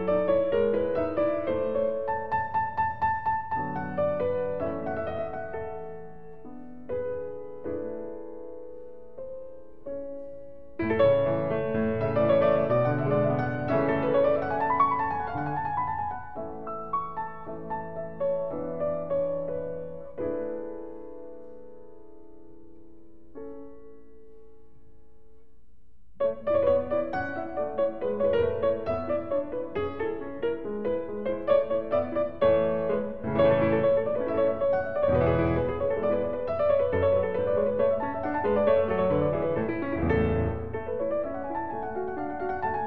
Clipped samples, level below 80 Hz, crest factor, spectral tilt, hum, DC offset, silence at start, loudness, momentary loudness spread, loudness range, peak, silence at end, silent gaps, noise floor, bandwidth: under 0.1%; -52 dBFS; 18 dB; -10 dB/octave; none; 0.8%; 0 s; -28 LUFS; 17 LU; 13 LU; -10 dBFS; 0 s; none; -61 dBFS; 5.2 kHz